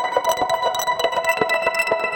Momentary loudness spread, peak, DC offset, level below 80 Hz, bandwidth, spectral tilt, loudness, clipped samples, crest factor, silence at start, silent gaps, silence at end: 2 LU; -2 dBFS; under 0.1%; -56 dBFS; over 20 kHz; -1.5 dB/octave; -20 LUFS; under 0.1%; 18 dB; 0 s; none; 0 s